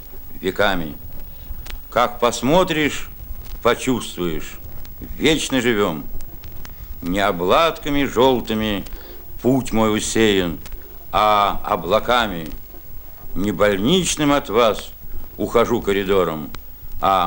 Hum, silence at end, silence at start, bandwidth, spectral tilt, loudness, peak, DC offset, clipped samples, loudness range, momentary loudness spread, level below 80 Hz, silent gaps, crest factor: none; 0 s; 0 s; 18 kHz; -4.5 dB/octave; -19 LUFS; -2 dBFS; under 0.1%; under 0.1%; 3 LU; 19 LU; -34 dBFS; none; 18 dB